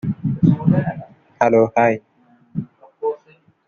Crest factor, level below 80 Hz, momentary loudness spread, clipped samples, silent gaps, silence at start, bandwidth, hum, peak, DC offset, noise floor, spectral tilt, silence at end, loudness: 18 dB; -52 dBFS; 17 LU; under 0.1%; none; 0.05 s; 6.8 kHz; none; -2 dBFS; under 0.1%; -54 dBFS; -9 dB/octave; 0.5 s; -18 LUFS